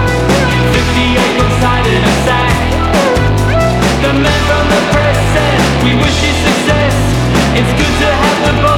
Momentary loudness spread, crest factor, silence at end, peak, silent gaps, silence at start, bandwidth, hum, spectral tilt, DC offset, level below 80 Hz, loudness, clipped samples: 1 LU; 10 dB; 0 s; 0 dBFS; none; 0 s; 18.5 kHz; none; -5 dB/octave; under 0.1%; -20 dBFS; -10 LUFS; under 0.1%